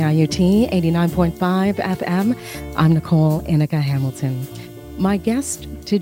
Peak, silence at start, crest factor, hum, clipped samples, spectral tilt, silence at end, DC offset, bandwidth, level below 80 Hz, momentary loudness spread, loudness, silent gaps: -2 dBFS; 0 s; 16 dB; none; under 0.1%; -7 dB/octave; 0 s; under 0.1%; 16.5 kHz; -40 dBFS; 11 LU; -19 LUFS; none